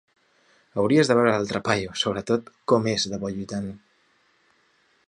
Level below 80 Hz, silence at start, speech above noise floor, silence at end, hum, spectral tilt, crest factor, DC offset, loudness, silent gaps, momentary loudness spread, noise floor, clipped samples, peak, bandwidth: -58 dBFS; 0.75 s; 41 dB; 1.3 s; none; -5 dB/octave; 22 dB; under 0.1%; -24 LUFS; none; 13 LU; -64 dBFS; under 0.1%; -4 dBFS; 10.5 kHz